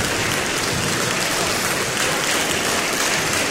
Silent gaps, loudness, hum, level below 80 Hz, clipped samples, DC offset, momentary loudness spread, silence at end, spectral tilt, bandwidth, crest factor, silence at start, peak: none; -19 LUFS; none; -46 dBFS; under 0.1%; under 0.1%; 2 LU; 0 s; -2 dB/octave; 16.5 kHz; 16 dB; 0 s; -6 dBFS